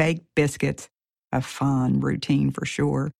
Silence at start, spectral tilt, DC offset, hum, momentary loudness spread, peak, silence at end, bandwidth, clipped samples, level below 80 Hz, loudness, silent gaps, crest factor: 0 s; -6.5 dB/octave; under 0.1%; none; 6 LU; -8 dBFS; 0.1 s; 13.5 kHz; under 0.1%; -50 dBFS; -24 LUFS; 0.94-0.98 s, 1.18-1.23 s; 16 dB